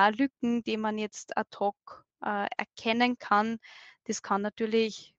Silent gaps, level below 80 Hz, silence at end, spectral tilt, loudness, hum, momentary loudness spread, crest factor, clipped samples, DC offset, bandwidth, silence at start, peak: none; -74 dBFS; 0.15 s; -4 dB/octave; -30 LUFS; none; 10 LU; 22 dB; under 0.1%; under 0.1%; 8.4 kHz; 0 s; -8 dBFS